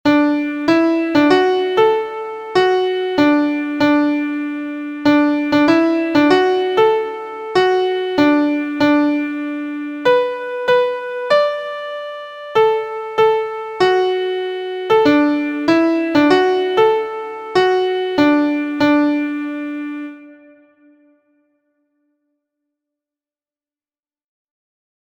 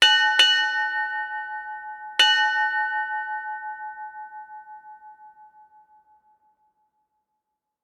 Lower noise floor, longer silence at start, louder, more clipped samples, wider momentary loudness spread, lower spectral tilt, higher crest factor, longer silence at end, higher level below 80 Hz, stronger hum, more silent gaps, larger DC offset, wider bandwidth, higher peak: first, under -90 dBFS vs -81 dBFS; about the same, 0.05 s vs 0 s; first, -16 LUFS vs -21 LUFS; neither; second, 11 LU vs 23 LU; first, -5.5 dB/octave vs 3.5 dB/octave; second, 16 dB vs 22 dB; first, 4.7 s vs 2.4 s; first, -58 dBFS vs -80 dBFS; neither; neither; neither; second, 8.4 kHz vs 18 kHz; first, 0 dBFS vs -4 dBFS